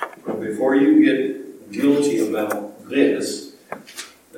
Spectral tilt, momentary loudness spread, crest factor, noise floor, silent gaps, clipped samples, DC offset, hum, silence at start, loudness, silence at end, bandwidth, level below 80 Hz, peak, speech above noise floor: -5 dB/octave; 20 LU; 18 dB; -39 dBFS; none; under 0.1%; under 0.1%; none; 0 s; -19 LUFS; 0 s; 16.5 kHz; -76 dBFS; -2 dBFS; 21 dB